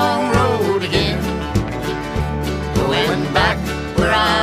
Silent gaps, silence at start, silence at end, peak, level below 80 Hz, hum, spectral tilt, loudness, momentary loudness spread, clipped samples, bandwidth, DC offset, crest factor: none; 0 s; 0 s; -2 dBFS; -30 dBFS; none; -5.5 dB/octave; -18 LUFS; 6 LU; under 0.1%; 15.5 kHz; under 0.1%; 16 dB